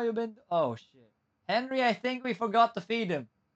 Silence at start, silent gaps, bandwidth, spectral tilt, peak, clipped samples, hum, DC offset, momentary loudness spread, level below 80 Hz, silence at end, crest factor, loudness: 0 s; none; 8.2 kHz; -6 dB/octave; -12 dBFS; under 0.1%; none; under 0.1%; 10 LU; -82 dBFS; 0.3 s; 20 dB; -30 LUFS